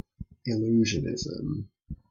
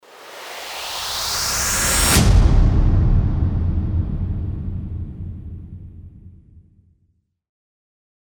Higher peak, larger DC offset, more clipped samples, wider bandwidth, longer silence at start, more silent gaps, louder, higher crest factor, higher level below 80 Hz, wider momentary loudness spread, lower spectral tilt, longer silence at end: second, -14 dBFS vs -2 dBFS; neither; neither; second, 7.4 kHz vs over 20 kHz; about the same, 0.2 s vs 0.15 s; neither; second, -29 LUFS vs -19 LUFS; about the same, 16 dB vs 16 dB; second, -50 dBFS vs -22 dBFS; second, 19 LU vs 22 LU; first, -5.5 dB/octave vs -4 dB/octave; second, 0.15 s vs 1.9 s